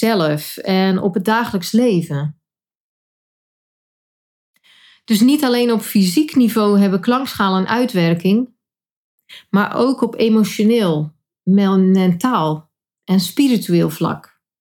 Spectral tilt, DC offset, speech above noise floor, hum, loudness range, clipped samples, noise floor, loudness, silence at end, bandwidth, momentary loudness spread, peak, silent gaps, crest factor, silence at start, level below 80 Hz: -6 dB/octave; under 0.1%; 35 dB; none; 6 LU; under 0.1%; -50 dBFS; -16 LUFS; 0.4 s; 18.5 kHz; 9 LU; -2 dBFS; 2.75-4.54 s, 8.92-9.18 s; 16 dB; 0 s; -62 dBFS